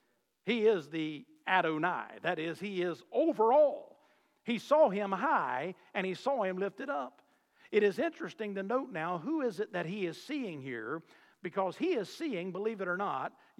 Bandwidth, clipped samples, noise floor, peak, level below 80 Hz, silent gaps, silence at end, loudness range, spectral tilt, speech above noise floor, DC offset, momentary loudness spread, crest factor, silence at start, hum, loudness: 13.5 kHz; under 0.1%; -69 dBFS; -14 dBFS; under -90 dBFS; none; 0.3 s; 6 LU; -6 dB/octave; 36 dB; under 0.1%; 12 LU; 20 dB; 0.45 s; none; -33 LUFS